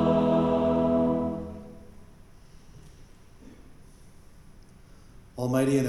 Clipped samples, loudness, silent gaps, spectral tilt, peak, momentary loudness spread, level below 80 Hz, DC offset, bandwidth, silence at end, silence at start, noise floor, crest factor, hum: under 0.1%; -25 LUFS; none; -7.5 dB/octave; -12 dBFS; 21 LU; -50 dBFS; under 0.1%; 12.5 kHz; 0 s; 0 s; -51 dBFS; 16 dB; none